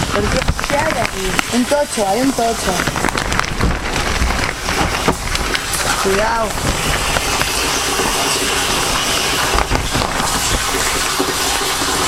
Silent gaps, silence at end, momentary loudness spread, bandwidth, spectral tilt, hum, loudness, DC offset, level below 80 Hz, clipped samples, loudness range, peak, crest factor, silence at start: none; 0 s; 3 LU; 16.5 kHz; -2.5 dB/octave; none; -16 LUFS; under 0.1%; -26 dBFS; under 0.1%; 2 LU; 0 dBFS; 16 dB; 0 s